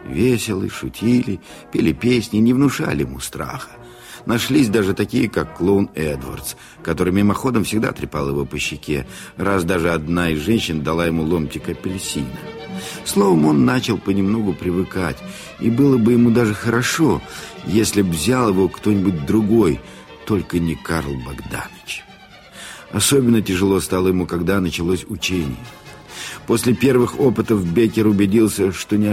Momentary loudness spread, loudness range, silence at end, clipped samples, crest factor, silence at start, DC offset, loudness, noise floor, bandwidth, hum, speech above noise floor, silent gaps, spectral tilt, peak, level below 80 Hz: 15 LU; 4 LU; 0 s; under 0.1%; 16 dB; 0 s; under 0.1%; -18 LUFS; -43 dBFS; 16.5 kHz; none; 25 dB; none; -5.5 dB/octave; -4 dBFS; -40 dBFS